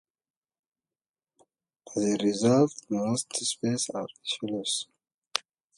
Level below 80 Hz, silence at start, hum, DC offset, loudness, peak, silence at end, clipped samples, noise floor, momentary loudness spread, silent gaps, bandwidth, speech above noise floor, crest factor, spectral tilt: -72 dBFS; 1.85 s; none; under 0.1%; -28 LUFS; -4 dBFS; 0.35 s; under 0.1%; under -90 dBFS; 11 LU; 5.14-5.22 s; 11.5 kHz; over 62 dB; 26 dB; -4 dB/octave